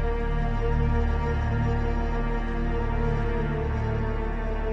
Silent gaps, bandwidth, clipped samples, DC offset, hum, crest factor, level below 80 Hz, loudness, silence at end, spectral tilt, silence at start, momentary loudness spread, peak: none; 6 kHz; under 0.1%; under 0.1%; none; 14 dB; -26 dBFS; -28 LUFS; 0 s; -8.5 dB/octave; 0 s; 4 LU; -12 dBFS